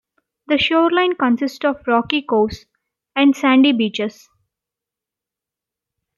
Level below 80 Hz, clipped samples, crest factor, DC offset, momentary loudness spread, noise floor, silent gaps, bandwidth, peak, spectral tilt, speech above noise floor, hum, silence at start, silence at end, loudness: -54 dBFS; under 0.1%; 16 dB; under 0.1%; 10 LU; -86 dBFS; none; 12 kHz; -2 dBFS; -5 dB/octave; 70 dB; none; 0.5 s; 2.05 s; -17 LUFS